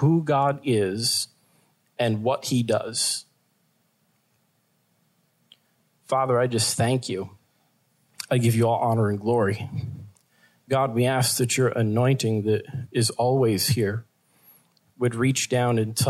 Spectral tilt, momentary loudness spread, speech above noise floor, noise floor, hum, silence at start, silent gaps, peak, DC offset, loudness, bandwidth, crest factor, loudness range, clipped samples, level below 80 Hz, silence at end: -5 dB/octave; 10 LU; 46 dB; -68 dBFS; none; 0 s; none; -10 dBFS; under 0.1%; -24 LUFS; 14.5 kHz; 14 dB; 6 LU; under 0.1%; -64 dBFS; 0 s